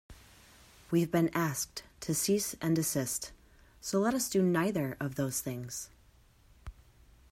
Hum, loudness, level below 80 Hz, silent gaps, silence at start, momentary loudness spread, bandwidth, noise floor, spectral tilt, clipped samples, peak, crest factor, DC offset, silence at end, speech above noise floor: none; -32 LUFS; -60 dBFS; none; 0.1 s; 16 LU; 16 kHz; -62 dBFS; -4.5 dB/octave; under 0.1%; -16 dBFS; 18 dB; under 0.1%; 0.6 s; 31 dB